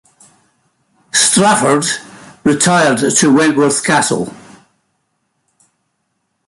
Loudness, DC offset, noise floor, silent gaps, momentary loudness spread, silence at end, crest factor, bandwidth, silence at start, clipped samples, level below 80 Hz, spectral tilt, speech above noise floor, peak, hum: -12 LUFS; under 0.1%; -68 dBFS; none; 9 LU; 2.15 s; 16 dB; 12 kHz; 1.15 s; under 0.1%; -54 dBFS; -3 dB/octave; 56 dB; 0 dBFS; none